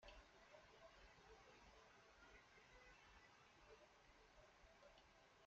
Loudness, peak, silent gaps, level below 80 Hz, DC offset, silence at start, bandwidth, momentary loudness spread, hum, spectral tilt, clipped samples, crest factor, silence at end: -68 LUFS; -50 dBFS; none; -76 dBFS; under 0.1%; 0 s; 7.6 kHz; 2 LU; none; -2 dB/octave; under 0.1%; 20 dB; 0 s